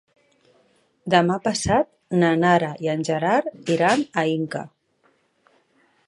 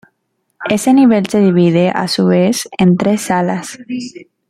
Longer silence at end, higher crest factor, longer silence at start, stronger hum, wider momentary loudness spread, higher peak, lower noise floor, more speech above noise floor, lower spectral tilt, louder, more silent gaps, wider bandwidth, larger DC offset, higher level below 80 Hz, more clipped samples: first, 1.4 s vs 0.25 s; first, 22 dB vs 12 dB; first, 1.05 s vs 0.6 s; neither; second, 9 LU vs 15 LU; about the same, -2 dBFS vs -2 dBFS; about the same, -64 dBFS vs -67 dBFS; second, 44 dB vs 55 dB; about the same, -5.5 dB/octave vs -6 dB/octave; second, -21 LUFS vs -13 LUFS; neither; second, 11.5 kHz vs 14 kHz; neither; about the same, -52 dBFS vs -54 dBFS; neither